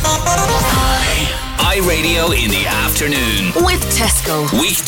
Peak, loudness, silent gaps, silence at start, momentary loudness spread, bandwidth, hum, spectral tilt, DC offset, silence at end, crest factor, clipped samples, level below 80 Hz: -4 dBFS; -14 LUFS; none; 0 s; 2 LU; 17 kHz; none; -3 dB/octave; under 0.1%; 0 s; 12 dB; under 0.1%; -22 dBFS